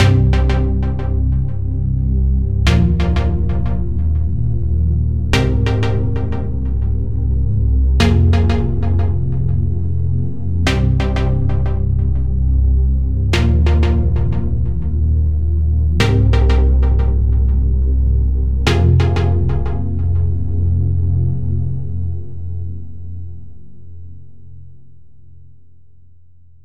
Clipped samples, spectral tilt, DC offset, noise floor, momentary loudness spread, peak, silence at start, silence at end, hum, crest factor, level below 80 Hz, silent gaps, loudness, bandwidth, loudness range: under 0.1%; -7.5 dB/octave; 6%; -49 dBFS; 7 LU; 0 dBFS; 0 s; 0 s; none; 14 dB; -18 dBFS; none; -17 LUFS; 8.4 kHz; 6 LU